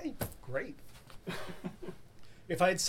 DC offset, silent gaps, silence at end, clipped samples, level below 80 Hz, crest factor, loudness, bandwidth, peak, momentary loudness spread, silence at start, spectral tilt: under 0.1%; none; 0 s; under 0.1%; -56 dBFS; 22 dB; -39 LUFS; 18 kHz; -14 dBFS; 24 LU; 0 s; -3.5 dB/octave